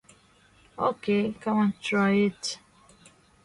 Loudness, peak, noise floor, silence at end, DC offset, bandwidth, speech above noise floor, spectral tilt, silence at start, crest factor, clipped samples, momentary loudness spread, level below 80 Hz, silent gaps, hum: -26 LUFS; -10 dBFS; -59 dBFS; 0.9 s; under 0.1%; 11.5 kHz; 34 dB; -5.5 dB/octave; 0.8 s; 18 dB; under 0.1%; 11 LU; -64 dBFS; none; none